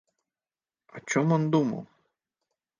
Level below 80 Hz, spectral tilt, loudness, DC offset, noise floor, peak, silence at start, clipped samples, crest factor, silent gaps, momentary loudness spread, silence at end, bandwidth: -76 dBFS; -6.5 dB/octave; -26 LUFS; under 0.1%; under -90 dBFS; -10 dBFS; 0.95 s; under 0.1%; 20 dB; none; 15 LU; 0.95 s; 10 kHz